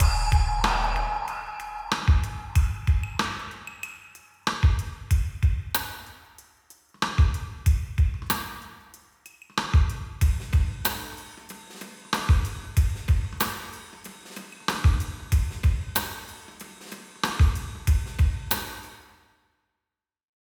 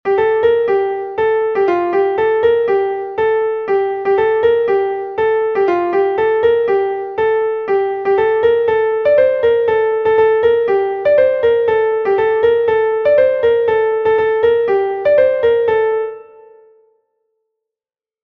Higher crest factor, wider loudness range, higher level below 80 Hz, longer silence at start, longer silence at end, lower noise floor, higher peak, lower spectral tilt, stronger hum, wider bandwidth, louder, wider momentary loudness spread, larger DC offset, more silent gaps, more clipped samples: first, 18 dB vs 12 dB; about the same, 2 LU vs 2 LU; first, -28 dBFS vs -52 dBFS; about the same, 0 s vs 0.05 s; second, 1.45 s vs 2 s; about the same, -89 dBFS vs under -90 dBFS; second, -8 dBFS vs -2 dBFS; second, -4.5 dB/octave vs -7 dB/octave; neither; first, over 20 kHz vs 4.7 kHz; second, -26 LUFS vs -14 LUFS; first, 18 LU vs 5 LU; neither; neither; neither